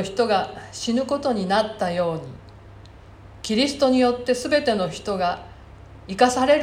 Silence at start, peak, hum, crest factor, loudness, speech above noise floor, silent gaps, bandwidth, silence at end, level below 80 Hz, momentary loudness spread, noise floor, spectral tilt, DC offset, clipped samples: 0 s; -4 dBFS; none; 18 dB; -22 LUFS; 23 dB; none; 15.5 kHz; 0 s; -50 dBFS; 15 LU; -44 dBFS; -4.5 dB/octave; under 0.1%; under 0.1%